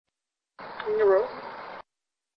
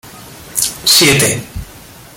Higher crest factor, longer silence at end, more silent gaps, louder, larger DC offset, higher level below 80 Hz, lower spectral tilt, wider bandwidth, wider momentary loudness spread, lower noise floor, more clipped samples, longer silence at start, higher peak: about the same, 18 dB vs 16 dB; first, 0.55 s vs 0.4 s; neither; second, -25 LUFS vs -11 LUFS; neither; second, -68 dBFS vs -38 dBFS; first, -7 dB/octave vs -2 dB/octave; second, 5.6 kHz vs 17.5 kHz; about the same, 22 LU vs 20 LU; first, -88 dBFS vs -36 dBFS; neither; first, 0.6 s vs 0.05 s; second, -12 dBFS vs 0 dBFS